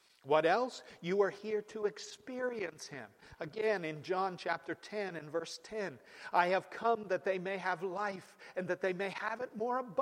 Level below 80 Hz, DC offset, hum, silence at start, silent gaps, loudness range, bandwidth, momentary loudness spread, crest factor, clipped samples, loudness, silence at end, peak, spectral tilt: -80 dBFS; under 0.1%; none; 0.25 s; none; 3 LU; 13.5 kHz; 13 LU; 20 dB; under 0.1%; -36 LUFS; 0 s; -16 dBFS; -5 dB/octave